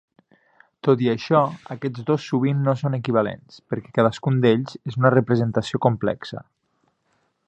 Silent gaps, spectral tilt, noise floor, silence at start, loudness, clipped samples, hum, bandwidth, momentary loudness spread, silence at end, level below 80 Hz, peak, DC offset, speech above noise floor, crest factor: none; -8 dB/octave; -69 dBFS; 0.85 s; -22 LUFS; under 0.1%; none; 8.4 kHz; 12 LU; 1.05 s; -60 dBFS; -2 dBFS; under 0.1%; 48 dB; 20 dB